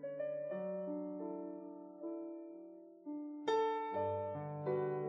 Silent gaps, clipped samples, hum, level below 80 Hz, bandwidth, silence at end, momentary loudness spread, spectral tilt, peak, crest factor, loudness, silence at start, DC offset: none; under 0.1%; none; -88 dBFS; 7 kHz; 0 s; 15 LU; -6 dB/octave; -24 dBFS; 16 dB; -41 LUFS; 0 s; under 0.1%